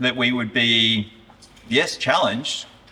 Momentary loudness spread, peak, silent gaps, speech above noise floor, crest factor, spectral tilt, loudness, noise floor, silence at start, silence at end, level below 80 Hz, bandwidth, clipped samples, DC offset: 11 LU; -4 dBFS; none; 27 dB; 18 dB; -3.5 dB/octave; -19 LUFS; -48 dBFS; 0 s; 0.25 s; -58 dBFS; 13.5 kHz; under 0.1%; under 0.1%